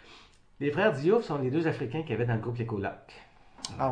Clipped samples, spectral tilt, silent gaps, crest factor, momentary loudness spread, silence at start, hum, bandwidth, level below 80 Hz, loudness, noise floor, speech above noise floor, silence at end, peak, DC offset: under 0.1%; -6.5 dB/octave; none; 20 dB; 12 LU; 0.05 s; none; 10 kHz; -60 dBFS; -30 LUFS; -55 dBFS; 26 dB; 0 s; -10 dBFS; under 0.1%